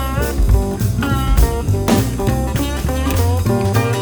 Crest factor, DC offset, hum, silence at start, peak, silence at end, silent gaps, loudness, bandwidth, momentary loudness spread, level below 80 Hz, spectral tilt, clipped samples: 14 dB; under 0.1%; none; 0 s; 0 dBFS; 0 s; none; -17 LUFS; over 20 kHz; 4 LU; -20 dBFS; -6 dB/octave; under 0.1%